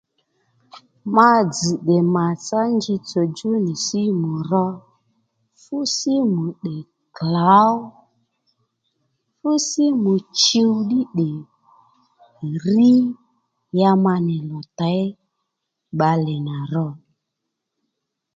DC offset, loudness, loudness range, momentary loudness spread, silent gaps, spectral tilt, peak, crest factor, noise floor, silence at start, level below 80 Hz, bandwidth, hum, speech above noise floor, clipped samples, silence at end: under 0.1%; -19 LUFS; 5 LU; 15 LU; none; -5.5 dB/octave; 0 dBFS; 20 dB; -79 dBFS; 0.75 s; -66 dBFS; 9.2 kHz; none; 61 dB; under 0.1%; 1.4 s